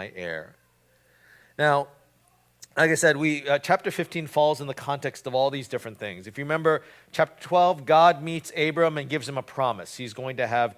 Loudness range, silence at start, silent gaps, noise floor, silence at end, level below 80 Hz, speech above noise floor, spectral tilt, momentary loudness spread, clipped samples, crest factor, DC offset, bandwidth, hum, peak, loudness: 4 LU; 0 s; none; -63 dBFS; 0.05 s; -68 dBFS; 39 dB; -4.5 dB/octave; 15 LU; under 0.1%; 20 dB; under 0.1%; 16 kHz; 60 Hz at -60 dBFS; -4 dBFS; -25 LUFS